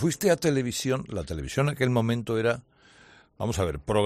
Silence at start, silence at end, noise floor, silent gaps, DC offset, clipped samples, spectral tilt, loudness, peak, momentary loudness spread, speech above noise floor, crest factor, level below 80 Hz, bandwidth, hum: 0 s; 0 s; -55 dBFS; none; under 0.1%; under 0.1%; -5.5 dB/octave; -27 LUFS; -10 dBFS; 9 LU; 29 dB; 18 dB; -46 dBFS; 14 kHz; none